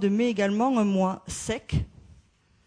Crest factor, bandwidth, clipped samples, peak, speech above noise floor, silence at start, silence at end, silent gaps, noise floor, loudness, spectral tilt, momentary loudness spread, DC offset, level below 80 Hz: 14 dB; 11 kHz; under 0.1%; -14 dBFS; 36 dB; 0 s; 0.55 s; none; -61 dBFS; -26 LUFS; -6 dB/octave; 8 LU; under 0.1%; -44 dBFS